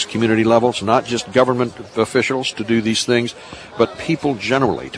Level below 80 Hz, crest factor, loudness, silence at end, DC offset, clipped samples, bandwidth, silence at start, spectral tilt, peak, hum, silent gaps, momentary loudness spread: -52 dBFS; 18 dB; -18 LUFS; 0 s; under 0.1%; under 0.1%; 11 kHz; 0 s; -5 dB/octave; 0 dBFS; none; none; 7 LU